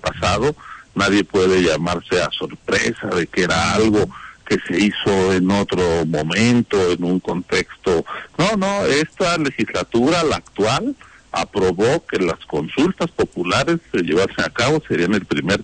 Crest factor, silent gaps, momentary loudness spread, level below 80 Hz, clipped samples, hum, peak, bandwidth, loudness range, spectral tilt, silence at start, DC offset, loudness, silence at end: 14 dB; none; 6 LU; -42 dBFS; under 0.1%; none; -4 dBFS; 10 kHz; 2 LU; -5 dB/octave; 0.05 s; under 0.1%; -19 LUFS; 0 s